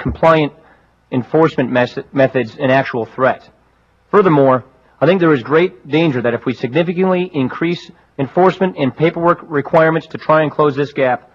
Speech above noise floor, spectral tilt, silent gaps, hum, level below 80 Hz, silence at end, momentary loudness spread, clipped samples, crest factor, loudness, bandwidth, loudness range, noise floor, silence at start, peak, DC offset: 40 dB; -8 dB/octave; none; none; -46 dBFS; 0.15 s; 8 LU; under 0.1%; 14 dB; -15 LUFS; 7.4 kHz; 2 LU; -55 dBFS; 0 s; 0 dBFS; under 0.1%